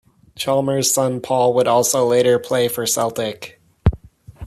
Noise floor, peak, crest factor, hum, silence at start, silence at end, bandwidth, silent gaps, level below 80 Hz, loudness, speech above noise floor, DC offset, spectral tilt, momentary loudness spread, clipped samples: -39 dBFS; -4 dBFS; 16 dB; none; 0.35 s; 0 s; 14 kHz; none; -36 dBFS; -18 LUFS; 22 dB; under 0.1%; -4 dB/octave; 10 LU; under 0.1%